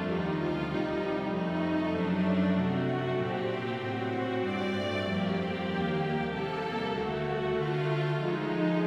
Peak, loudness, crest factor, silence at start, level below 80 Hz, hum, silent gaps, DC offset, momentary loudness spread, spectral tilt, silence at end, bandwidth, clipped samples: -16 dBFS; -31 LUFS; 14 dB; 0 s; -56 dBFS; none; none; under 0.1%; 4 LU; -7.5 dB/octave; 0 s; 9.2 kHz; under 0.1%